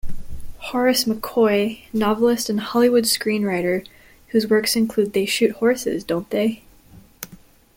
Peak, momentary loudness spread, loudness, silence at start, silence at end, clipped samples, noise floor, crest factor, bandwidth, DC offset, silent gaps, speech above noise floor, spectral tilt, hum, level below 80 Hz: -6 dBFS; 18 LU; -20 LUFS; 0.05 s; 0.4 s; under 0.1%; -48 dBFS; 16 dB; 17 kHz; under 0.1%; none; 28 dB; -4 dB/octave; none; -42 dBFS